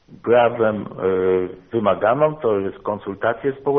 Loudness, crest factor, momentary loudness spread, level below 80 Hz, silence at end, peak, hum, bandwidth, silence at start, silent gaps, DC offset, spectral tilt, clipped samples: -20 LUFS; 16 dB; 8 LU; -56 dBFS; 0 s; -4 dBFS; none; 3.8 kHz; 0.1 s; none; under 0.1%; -5.5 dB/octave; under 0.1%